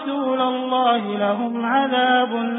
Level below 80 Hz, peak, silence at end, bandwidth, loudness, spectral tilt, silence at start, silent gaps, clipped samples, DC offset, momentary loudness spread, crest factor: -74 dBFS; -6 dBFS; 0 s; 4 kHz; -20 LUFS; -9.5 dB/octave; 0 s; none; under 0.1%; under 0.1%; 5 LU; 14 dB